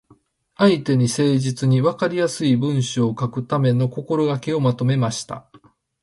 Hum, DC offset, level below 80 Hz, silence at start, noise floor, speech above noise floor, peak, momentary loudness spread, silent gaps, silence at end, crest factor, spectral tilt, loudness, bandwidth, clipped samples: none; under 0.1%; -58 dBFS; 0.6 s; -56 dBFS; 37 dB; -4 dBFS; 5 LU; none; 0.45 s; 16 dB; -6.5 dB/octave; -20 LUFS; 11.5 kHz; under 0.1%